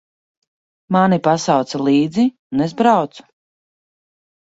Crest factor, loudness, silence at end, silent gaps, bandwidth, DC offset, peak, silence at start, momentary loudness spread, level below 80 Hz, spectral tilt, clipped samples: 18 dB; -16 LUFS; 1.2 s; 2.39-2.50 s; 8 kHz; under 0.1%; -2 dBFS; 0.9 s; 6 LU; -60 dBFS; -6 dB/octave; under 0.1%